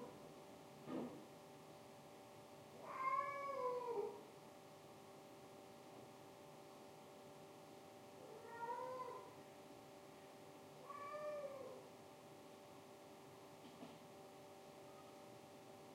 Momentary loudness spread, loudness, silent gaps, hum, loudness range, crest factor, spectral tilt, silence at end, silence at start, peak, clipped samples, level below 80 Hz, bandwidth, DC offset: 15 LU; -53 LUFS; none; none; 12 LU; 22 dB; -4.5 dB/octave; 0 s; 0 s; -32 dBFS; under 0.1%; under -90 dBFS; 16 kHz; under 0.1%